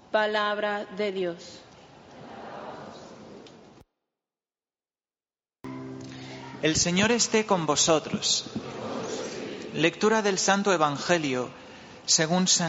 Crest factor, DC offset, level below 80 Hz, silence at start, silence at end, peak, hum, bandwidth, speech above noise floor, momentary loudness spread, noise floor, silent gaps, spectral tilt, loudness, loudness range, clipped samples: 22 dB; under 0.1%; -60 dBFS; 0.1 s; 0 s; -6 dBFS; none; 8 kHz; over 65 dB; 21 LU; under -90 dBFS; none; -3 dB/octave; -25 LUFS; 21 LU; under 0.1%